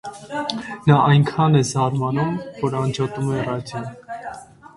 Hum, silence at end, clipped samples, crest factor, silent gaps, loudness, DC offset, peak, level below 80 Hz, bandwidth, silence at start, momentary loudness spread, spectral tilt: none; 0.1 s; under 0.1%; 20 dB; none; -20 LUFS; under 0.1%; 0 dBFS; -52 dBFS; 11.5 kHz; 0.05 s; 17 LU; -6.5 dB/octave